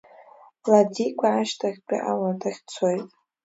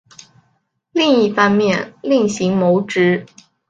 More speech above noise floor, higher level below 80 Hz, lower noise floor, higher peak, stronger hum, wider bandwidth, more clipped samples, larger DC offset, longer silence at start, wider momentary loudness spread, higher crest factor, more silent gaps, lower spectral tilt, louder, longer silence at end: second, 28 dB vs 49 dB; second, -76 dBFS vs -60 dBFS; second, -51 dBFS vs -64 dBFS; about the same, -4 dBFS vs -2 dBFS; neither; second, 8 kHz vs 9 kHz; neither; neither; second, 0.2 s vs 0.95 s; first, 12 LU vs 6 LU; about the same, 20 dB vs 16 dB; neither; about the same, -5.5 dB/octave vs -5.5 dB/octave; second, -24 LUFS vs -16 LUFS; about the same, 0.35 s vs 0.45 s